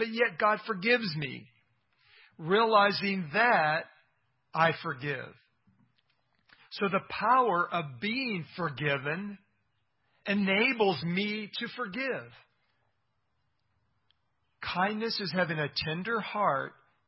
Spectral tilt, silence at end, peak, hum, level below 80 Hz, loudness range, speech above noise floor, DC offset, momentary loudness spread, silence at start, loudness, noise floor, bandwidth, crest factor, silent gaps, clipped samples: -9 dB/octave; 0.4 s; -10 dBFS; none; -70 dBFS; 8 LU; 50 dB; under 0.1%; 13 LU; 0 s; -29 LUFS; -79 dBFS; 5.8 kHz; 22 dB; none; under 0.1%